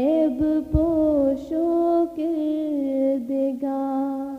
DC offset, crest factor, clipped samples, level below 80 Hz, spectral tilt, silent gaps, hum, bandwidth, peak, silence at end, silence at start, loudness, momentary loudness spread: under 0.1%; 14 dB; under 0.1%; -40 dBFS; -9.5 dB/octave; none; none; 5.2 kHz; -8 dBFS; 0 s; 0 s; -23 LUFS; 5 LU